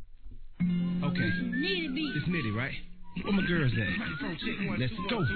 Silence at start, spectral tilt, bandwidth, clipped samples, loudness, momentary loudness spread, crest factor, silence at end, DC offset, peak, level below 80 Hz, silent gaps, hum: 0 s; -9.5 dB/octave; 4.6 kHz; under 0.1%; -31 LUFS; 6 LU; 14 dB; 0 s; 0.2%; -16 dBFS; -46 dBFS; none; none